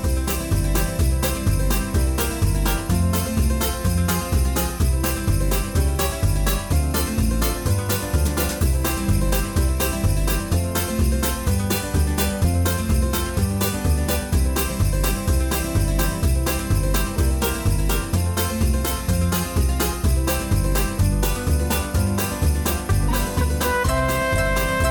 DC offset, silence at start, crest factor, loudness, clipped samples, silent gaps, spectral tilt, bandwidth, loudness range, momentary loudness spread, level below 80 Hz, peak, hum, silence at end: under 0.1%; 0 s; 12 dB; -22 LUFS; under 0.1%; none; -5 dB/octave; over 20 kHz; 0 LU; 2 LU; -24 dBFS; -8 dBFS; none; 0 s